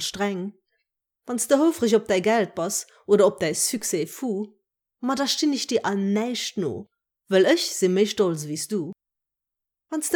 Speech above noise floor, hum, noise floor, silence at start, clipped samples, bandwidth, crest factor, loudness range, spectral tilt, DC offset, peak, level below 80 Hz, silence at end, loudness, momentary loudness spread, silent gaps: 63 dB; none; -86 dBFS; 0 s; under 0.1%; over 20 kHz; 18 dB; 3 LU; -4 dB/octave; under 0.1%; -6 dBFS; -68 dBFS; 0 s; -23 LUFS; 12 LU; none